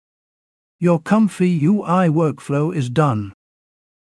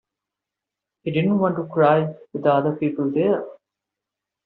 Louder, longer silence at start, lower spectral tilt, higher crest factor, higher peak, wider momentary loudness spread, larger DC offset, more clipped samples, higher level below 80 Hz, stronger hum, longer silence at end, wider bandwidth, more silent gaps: first, -18 LUFS vs -21 LUFS; second, 0.8 s vs 1.05 s; first, -8 dB/octave vs -6.5 dB/octave; about the same, 16 dB vs 18 dB; about the same, -4 dBFS vs -4 dBFS; second, 6 LU vs 9 LU; neither; neither; about the same, -62 dBFS vs -66 dBFS; neither; about the same, 0.9 s vs 0.9 s; first, 12 kHz vs 4.3 kHz; neither